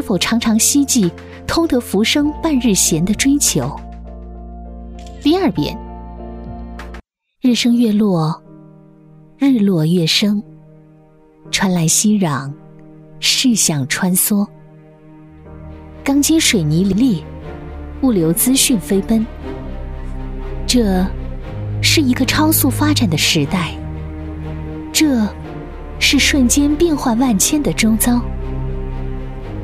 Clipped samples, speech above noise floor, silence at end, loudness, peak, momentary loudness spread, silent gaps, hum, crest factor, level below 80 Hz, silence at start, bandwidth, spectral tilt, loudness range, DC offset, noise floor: under 0.1%; 32 dB; 0 s; -15 LUFS; 0 dBFS; 19 LU; none; none; 16 dB; -30 dBFS; 0 s; 16 kHz; -4 dB/octave; 4 LU; under 0.1%; -46 dBFS